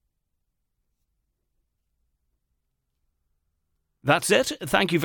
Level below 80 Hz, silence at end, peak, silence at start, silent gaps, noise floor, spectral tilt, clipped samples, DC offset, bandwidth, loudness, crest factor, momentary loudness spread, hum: -60 dBFS; 0 s; -6 dBFS; 4.05 s; none; -77 dBFS; -3.5 dB/octave; under 0.1%; under 0.1%; 17.5 kHz; -23 LUFS; 24 dB; 5 LU; none